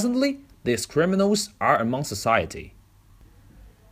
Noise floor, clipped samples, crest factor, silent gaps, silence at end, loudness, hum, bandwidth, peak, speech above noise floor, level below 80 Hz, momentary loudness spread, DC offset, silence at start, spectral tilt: -53 dBFS; under 0.1%; 20 dB; none; 0.25 s; -23 LUFS; none; 15.5 kHz; -6 dBFS; 30 dB; -52 dBFS; 8 LU; under 0.1%; 0 s; -4.5 dB/octave